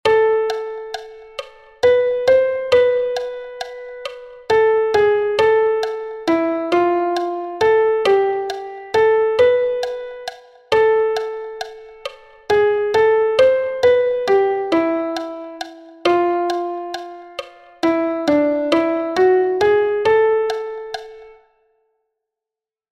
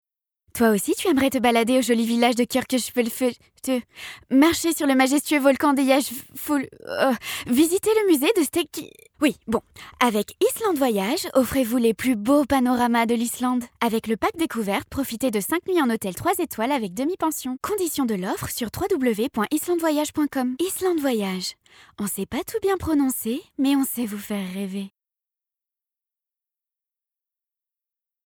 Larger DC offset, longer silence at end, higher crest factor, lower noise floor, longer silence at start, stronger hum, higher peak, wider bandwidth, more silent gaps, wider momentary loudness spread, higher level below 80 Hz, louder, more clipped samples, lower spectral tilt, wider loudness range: neither; second, 1.6 s vs 3.4 s; about the same, 16 dB vs 20 dB; about the same, -88 dBFS vs -87 dBFS; second, 0.05 s vs 0.55 s; neither; about the same, -2 dBFS vs -4 dBFS; second, 11 kHz vs over 20 kHz; neither; first, 17 LU vs 9 LU; about the same, -56 dBFS vs -56 dBFS; first, -17 LUFS vs -23 LUFS; neither; about the same, -5 dB/octave vs -4 dB/octave; about the same, 4 LU vs 4 LU